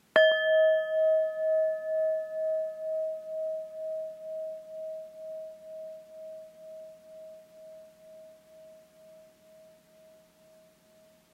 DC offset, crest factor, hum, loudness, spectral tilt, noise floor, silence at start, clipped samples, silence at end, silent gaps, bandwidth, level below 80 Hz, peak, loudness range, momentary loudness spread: under 0.1%; 24 dB; none; -29 LUFS; -2.5 dB/octave; -61 dBFS; 0.15 s; under 0.1%; 2.15 s; none; 7.2 kHz; -84 dBFS; -8 dBFS; 24 LU; 26 LU